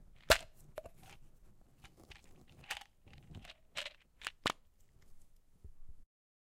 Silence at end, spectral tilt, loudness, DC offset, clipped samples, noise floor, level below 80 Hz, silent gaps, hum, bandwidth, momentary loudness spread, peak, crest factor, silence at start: 0.45 s; -2 dB/octave; -38 LUFS; under 0.1%; under 0.1%; -64 dBFS; -56 dBFS; none; none; 16 kHz; 29 LU; -10 dBFS; 34 dB; 0 s